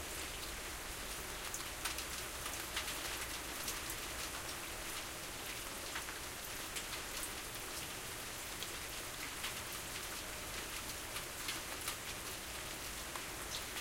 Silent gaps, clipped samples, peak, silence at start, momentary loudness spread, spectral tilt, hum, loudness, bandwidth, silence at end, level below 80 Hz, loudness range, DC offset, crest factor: none; under 0.1%; -24 dBFS; 0 s; 3 LU; -1.5 dB/octave; none; -42 LUFS; 17 kHz; 0 s; -56 dBFS; 2 LU; under 0.1%; 20 dB